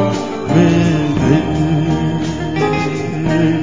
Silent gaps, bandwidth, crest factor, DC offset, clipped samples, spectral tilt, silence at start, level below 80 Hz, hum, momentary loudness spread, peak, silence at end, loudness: none; 7.6 kHz; 14 dB; 2%; under 0.1%; -7 dB/octave; 0 s; -34 dBFS; none; 7 LU; 0 dBFS; 0 s; -15 LUFS